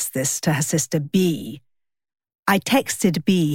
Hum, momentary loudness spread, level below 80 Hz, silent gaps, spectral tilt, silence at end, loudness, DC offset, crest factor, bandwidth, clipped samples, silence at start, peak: none; 6 LU; -60 dBFS; 2.35-2.43 s; -4.5 dB/octave; 0 s; -21 LUFS; under 0.1%; 18 dB; 17 kHz; under 0.1%; 0 s; -4 dBFS